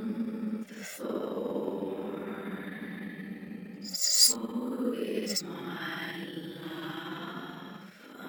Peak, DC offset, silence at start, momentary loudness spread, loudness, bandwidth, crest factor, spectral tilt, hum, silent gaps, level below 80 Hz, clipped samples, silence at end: -8 dBFS; under 0.1%; 0 s; 17 LU; -32 LUFS; over 20 kHz; 26 dB; -2 dB/octave; none; none; -78 dBFS; under 0.1%; 0 s